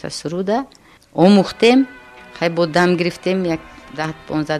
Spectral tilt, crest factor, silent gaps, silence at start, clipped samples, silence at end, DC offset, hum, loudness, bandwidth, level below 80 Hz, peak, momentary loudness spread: -6 dB/octave; 16 dB; none; 0.05 s; under 0.1%; 0 s; under 0.1%; none; -17 LUFS; 13 kHz; -52 dBFS; -2 dBFS; 14 LU